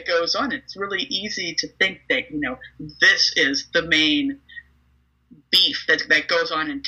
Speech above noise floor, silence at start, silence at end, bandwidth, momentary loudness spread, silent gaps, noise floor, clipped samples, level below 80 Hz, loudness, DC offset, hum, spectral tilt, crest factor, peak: 40 dB; 0 s; 0 s; 15 kHz; 12 LU; none; -62 dBFS; under 0.1%; -56 dBFS; -19 LUFS; under 0.1%; none; -2 dB/octave; 20 dB; -2 dBFS